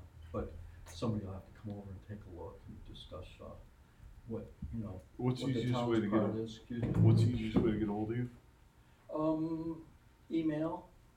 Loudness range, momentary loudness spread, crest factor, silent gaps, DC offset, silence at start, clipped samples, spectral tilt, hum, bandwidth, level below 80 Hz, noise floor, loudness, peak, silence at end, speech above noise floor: 15 LU; 19 LU; 20 dB; none; under 0.1%; 0 s; under 0.1%; -8.5 dB/octave; none; 10 kHz; -54 dBFS; -63 dBFS; -36 LUFS; -18 dBFS; 0.3 s; 28 dB